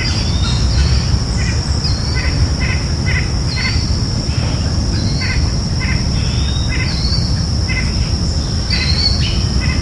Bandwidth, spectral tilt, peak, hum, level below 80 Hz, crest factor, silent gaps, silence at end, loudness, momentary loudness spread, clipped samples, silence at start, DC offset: 11.5 kHz; -4.5 dB/octave; -2 dBFS; none; -20 dBFS; 12 dB; none; 0 s; -16 LUFS; 3 LU; under 0.1%; 0 s; under 0.1%